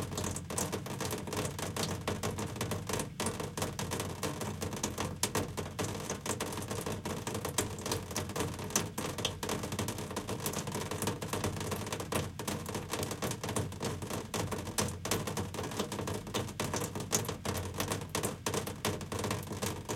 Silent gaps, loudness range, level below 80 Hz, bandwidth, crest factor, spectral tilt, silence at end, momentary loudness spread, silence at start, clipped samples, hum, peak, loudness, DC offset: none; 1 LU; -58 dBFS; 17 kHz; 24 dB; -4 dB/octave; 0 s; 4 LU; 0 s; under 0.1%; none; -12 dBFS; -36 LUFS; under 0.1%